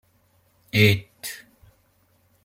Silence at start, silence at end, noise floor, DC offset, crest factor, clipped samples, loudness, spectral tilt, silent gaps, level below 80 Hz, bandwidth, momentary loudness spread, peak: 0.75 s; 1.1 s; -63 dBFS; under 0.1%; 22 dB; under 0.1%; -22 LUFS; -5 dB/octave; none; -58 dBFS; 16.5 kHz; 18 LU; -4 dBFS